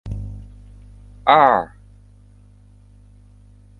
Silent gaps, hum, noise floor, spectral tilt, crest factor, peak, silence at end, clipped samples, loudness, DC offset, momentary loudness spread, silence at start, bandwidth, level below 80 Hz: none; 50 Hz at -45 dBFS; -48 dBFS; -7 dB/octave; 22 dB; 0 dBFS; 2.15 s; under 0.1%; -17 LUFS; under 0.1%; 22 LU; 0.05 s; 7.4 kHz; -42 dBFS